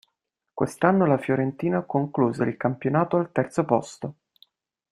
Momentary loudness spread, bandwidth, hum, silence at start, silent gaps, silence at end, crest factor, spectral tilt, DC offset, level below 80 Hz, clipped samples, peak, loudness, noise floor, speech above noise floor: 10 LU; 13 kHz; none; 0.55 s; none; 0.8 s; 20 dB; -8 dB/octave; under 0.1%; -64 dBFS; under 0.1%; -4 dBFS; -24 LUFS; -80 dBFS; 56 dB